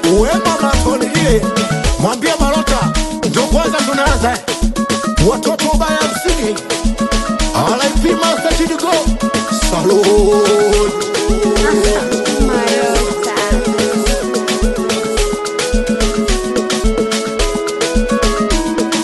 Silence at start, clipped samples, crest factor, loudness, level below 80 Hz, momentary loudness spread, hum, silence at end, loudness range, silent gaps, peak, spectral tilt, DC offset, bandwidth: 0 s; under 0.1%; 14 dB; -14 LUFS; -20 dBFS; 5 LU; none; 0 s; 3 LU; none; 0 dBFS; -4 dB/octave; under 0.1%; 12.5 kHz